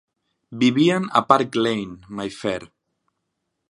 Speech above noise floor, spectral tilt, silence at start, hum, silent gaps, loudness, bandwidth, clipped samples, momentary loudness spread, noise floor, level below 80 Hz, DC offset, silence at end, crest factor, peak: 57 dB; -5.5 dB/octave; 0.5 s; none; none; -20 LUFS; 11.5 kHz; under 0.1%; 14 LU; -77 dBFS; -60 dBFS; under 0.1%; 1.05 s; 22 dB; 0 dBFS